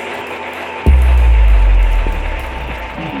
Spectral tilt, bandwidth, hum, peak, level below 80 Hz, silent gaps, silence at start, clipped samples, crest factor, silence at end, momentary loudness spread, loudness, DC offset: -7 dB/octave; 5 kHz; none; 0 dBFS; -12 dBFS; none; 0 s; under 0.1%; 12 dB; 0 s; 12 LU; -15 LUFS; under 0.1%